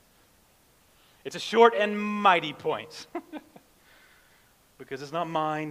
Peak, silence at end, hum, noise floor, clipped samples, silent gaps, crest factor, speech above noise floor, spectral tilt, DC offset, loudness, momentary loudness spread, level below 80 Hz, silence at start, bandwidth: -4 dBFS; 0 s; none; -62 dBFS; under 0.1%; none; 26 dB; 36 dB; -4.5 dB/octave; under 0.1%; -25 LUFS; 20 LU; -72 dBFS; 1.25 s; 15.5 kHz